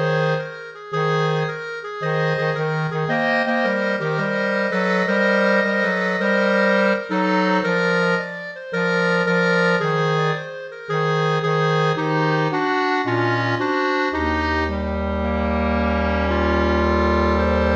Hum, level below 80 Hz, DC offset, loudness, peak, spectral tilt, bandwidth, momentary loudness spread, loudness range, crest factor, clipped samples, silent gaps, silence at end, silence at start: none; -34 dBFS; under 0.1%; -20 LUFS; -4 dBFS; -6.5 dB/octave; 8.4 kHz; 6 LU; 3 LU; 16 dB; under 0.1%; none; 0 s; 0 s